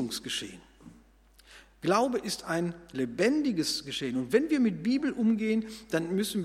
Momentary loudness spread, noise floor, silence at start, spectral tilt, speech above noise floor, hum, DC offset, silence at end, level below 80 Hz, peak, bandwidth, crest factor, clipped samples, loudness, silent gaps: 8 LU; -59 dBFS; 0 s; -4.5 dB/octave; 30 dB; none; under 0.1%; 0 s; -62 dBFS; -10 dBFS; 15.5 kHz; 20 dB; under 0.1%; -29 LUFS; none